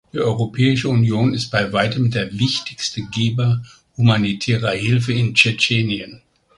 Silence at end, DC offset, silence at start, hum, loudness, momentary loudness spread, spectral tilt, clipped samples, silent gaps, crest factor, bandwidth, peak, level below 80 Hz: 0.4 s; under 0.1%; 0.15 s; none; -18 LUFS; 9 LU; -5.5 dB/octave; under 0.1%; none; 18 dB; 11 kHz; 0 dBFS; -48 dBFS